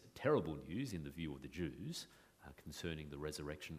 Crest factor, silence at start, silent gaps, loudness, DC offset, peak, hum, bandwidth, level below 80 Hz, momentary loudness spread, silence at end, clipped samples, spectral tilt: 22 dB; 0 s; none; -44 LUFS; under 0.1%; -22 dBFS; none; 15.5 kHz; -62 dBFS; 19 LU; 0 s; under 0.1%; -5.5 dB/octave